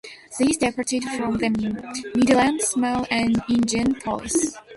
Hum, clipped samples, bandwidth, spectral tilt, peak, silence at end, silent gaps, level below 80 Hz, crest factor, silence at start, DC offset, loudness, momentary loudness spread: none; under 0.1%; 12 kHz; -3.5 dB/octave; -6 dBFS; 0 s; none; -50 dBFS; 16 dB; 0.05 s; under 0.1%; -22 LUFS; 8 LU